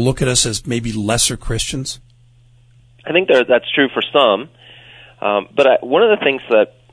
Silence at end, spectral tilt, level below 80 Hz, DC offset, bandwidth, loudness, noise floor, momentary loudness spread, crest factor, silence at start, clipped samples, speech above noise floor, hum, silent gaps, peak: 0.25 s; -3.5 dB/octave; -38 dBFS; under 0.1%; 11 kHz; -15 LUFS; -49 dBFS; 10 LU; 16 dB; 0 s; under 0.1%; 34 dB; none; none; 0 dBFS